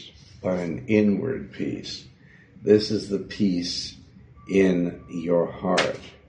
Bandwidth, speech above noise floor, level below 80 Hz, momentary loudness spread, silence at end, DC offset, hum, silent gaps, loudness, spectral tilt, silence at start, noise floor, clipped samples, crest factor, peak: 9.6 kHz; 27 dB; -54 dBFS; 12 LU; 0.2 s; under 0.1%; none; none; -24 LUFS; -6 dB/octave; 0 s; -51 dBFS; under 0.1%; 20 dB; -4 dBFS